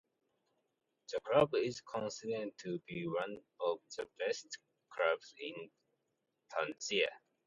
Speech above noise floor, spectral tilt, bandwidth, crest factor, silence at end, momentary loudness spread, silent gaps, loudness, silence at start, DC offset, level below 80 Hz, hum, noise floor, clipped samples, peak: 47 dB; -4 dB/octave; 8.4 kHz; 24 dB; 0.3 s; 14 LU; none; -38 LUFS; 1.1 s; under 0.1%; -76 dBFS; none; -85 dBFS; under 0.1%; -16 dBFS